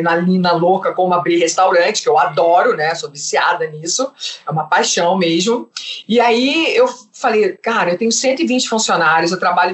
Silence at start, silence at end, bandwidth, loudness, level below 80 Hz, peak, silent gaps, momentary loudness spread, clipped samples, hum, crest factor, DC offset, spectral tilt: 0 s; 0 s; 8.4 kHz; -15 LUFS; -66 dBFS; -2 dBFS; none; 7 LU; under 0.1%; none; 12 dB; under 0.1%; -3.5 dB/octave